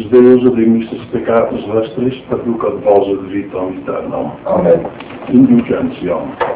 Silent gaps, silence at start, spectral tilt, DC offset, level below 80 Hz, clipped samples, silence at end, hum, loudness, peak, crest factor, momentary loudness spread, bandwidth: none; 0 s; -12 dB/octave; under 0.1%; -44 dBFS; 0.6%; 0 s; none; -13 LUFS; 0 dBFS; 12 dB; 12 LU; 4 kHz